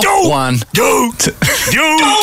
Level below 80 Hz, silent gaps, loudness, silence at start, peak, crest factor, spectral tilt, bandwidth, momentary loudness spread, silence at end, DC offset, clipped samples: -38 dBFS; none; -11 LUFS; 0 s; -2 dBFS; 10 dB; -3 dB/octave; 16.5 kHz; 5 LU; 0 s; under 0.1%; under 0.1%